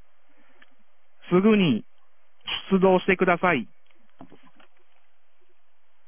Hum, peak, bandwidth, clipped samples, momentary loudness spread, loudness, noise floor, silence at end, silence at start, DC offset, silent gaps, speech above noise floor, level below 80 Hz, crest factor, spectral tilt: none; -4 dBFS; 3.6 kHz; under 0.1%; 11 LU; -22 LUFS; -71 dBFS; 1.85 s; 1.3 s; 0.8%; none; 51 dB; -60 dBFS; 22 dB; -10.5 dB/octave